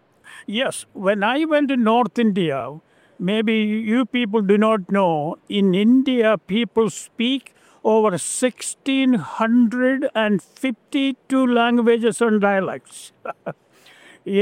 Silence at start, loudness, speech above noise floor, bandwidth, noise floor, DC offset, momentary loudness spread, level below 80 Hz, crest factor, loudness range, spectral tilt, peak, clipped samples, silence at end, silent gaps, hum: 0.25 s; -19 LUFS; 30 dB; 14 kHz; -49 dBFS; under 0.1%; 11 LU; -68 dBFS; 16 dB; 2 LU; -5 dB/octave; -4 dBFS; under 0.1%; 0 s; none; none